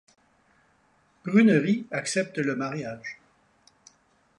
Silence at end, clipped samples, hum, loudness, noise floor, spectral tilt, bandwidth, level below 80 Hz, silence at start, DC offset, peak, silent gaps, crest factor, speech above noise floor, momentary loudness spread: 1.25 s; under 0.1%; none; -25 LUFS; -65 dBFS; -5.5 dB/octave; 11 kHz; -72 dBFS; 1.25 s; under 0.1%; -8 dBFS; none; 20 dB; 40 dB; 20 LU